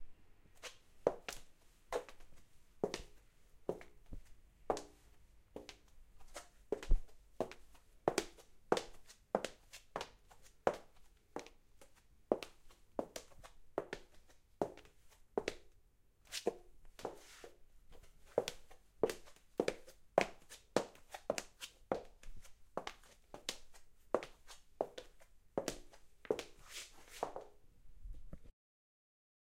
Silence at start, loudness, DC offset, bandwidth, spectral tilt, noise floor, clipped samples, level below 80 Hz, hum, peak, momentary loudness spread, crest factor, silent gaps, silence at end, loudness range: 0 s; -44 LUFS; under 0.1%; 16 kHz; -4 dB/octave; -69 dBFS; under 0.1%; -52 dBFS; none; -12 dBFS; 20 LU; 32 dB; none; 1 s; 7 LU